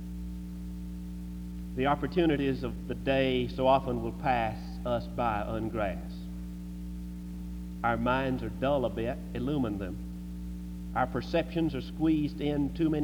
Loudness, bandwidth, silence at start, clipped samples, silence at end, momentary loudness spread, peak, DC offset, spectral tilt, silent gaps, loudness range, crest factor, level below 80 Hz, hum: -32 LUFS; over 20 kHz; 0 s; under 0.1%; 0 s; 13 LU; -12 dBFS; under 0.1%; -7.5 dB/octave; none; 5 LU; 20 dB; -42 dBFS; 60 Hz at -40 dBFS